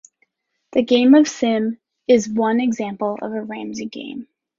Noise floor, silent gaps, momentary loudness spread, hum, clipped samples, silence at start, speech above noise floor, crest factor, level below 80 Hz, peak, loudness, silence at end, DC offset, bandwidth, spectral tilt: -67 dBFS; none; 17 LU; none; under 0.1%; 0.75 s; 49 dB; 16 dB; -62 dBFS; -2 dBFS; -19 LUFS; 0.35 s; under 0.1%; 7.6 kHz; -4.5 dB/octave